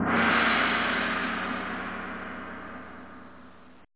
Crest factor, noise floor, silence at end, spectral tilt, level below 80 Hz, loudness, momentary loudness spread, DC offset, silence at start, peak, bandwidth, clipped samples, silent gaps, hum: 18 dB; -51 dBFS; 0 s; -1.5 dB/octave; -56 dBFS; -26 LUFS; 22 LU; 0.3%; 0 s; -10 dBFS; 4 kHz; under 0.1%; none; none